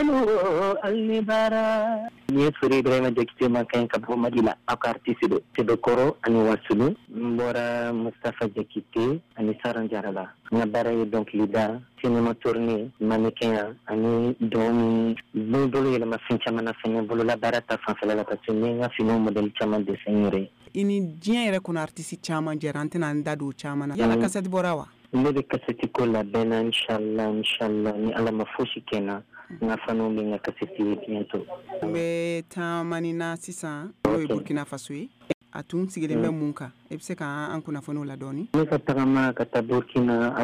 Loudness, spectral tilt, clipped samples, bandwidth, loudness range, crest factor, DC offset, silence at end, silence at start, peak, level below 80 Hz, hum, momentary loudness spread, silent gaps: -26 LUFS; -6 dB/octave; under 0.1%; 13 kHz; 5 LU; 16 dB; under 0.1%; 0 s; 0 s; -10 dBFS; -58 dBFS; none; 9 LU; 35.34-35.41 s